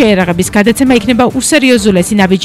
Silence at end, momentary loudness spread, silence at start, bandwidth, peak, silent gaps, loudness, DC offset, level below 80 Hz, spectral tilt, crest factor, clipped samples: 0 s; 3 LU; 0 s; 15 kHz; 0 dBFS; none; -9 LUFS; under 0.1%; -34 dBFS; -4.5 dB/octave; 8 dB; 0.3%